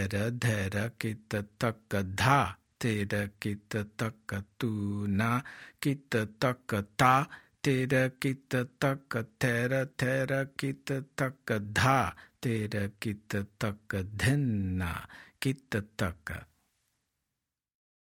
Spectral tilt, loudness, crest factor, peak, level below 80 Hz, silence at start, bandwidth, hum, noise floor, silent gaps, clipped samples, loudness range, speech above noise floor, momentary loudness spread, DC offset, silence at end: -6 dB/octave; -31 LUFS; 24 dB; -8 dBFS; -60 dBFS; 0 s; 17 kHz; none; -88 dBFS; none; under 0.1%; 4 LU; 57 dB; 10 LU; under 0.1%; 1.75 s